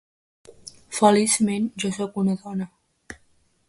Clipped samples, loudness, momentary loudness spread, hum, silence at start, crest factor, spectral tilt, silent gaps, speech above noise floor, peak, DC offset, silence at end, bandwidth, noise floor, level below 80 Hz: under 0.1%; -22 LUFS; 25 LU; none; 0.65 s; 22 dB; -4.5 dB/octave; none; 41 dB; -2 dBFS; under 0.1%; 0.55 s; 11.5 kHz; -62 dBFS; -62 dBFS